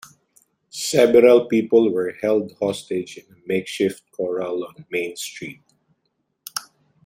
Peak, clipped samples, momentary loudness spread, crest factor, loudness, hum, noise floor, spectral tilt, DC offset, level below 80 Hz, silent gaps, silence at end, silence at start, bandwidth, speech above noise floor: -2 dBFS; under 0.1%; 19 LU; 20 dB; -20 LUFS; none; -73 dBFS; -4.5 dB/octave; under 0.1%; -66 dBFS; none; 0.45 s; 0.75 s; 16 kHz; 53 dB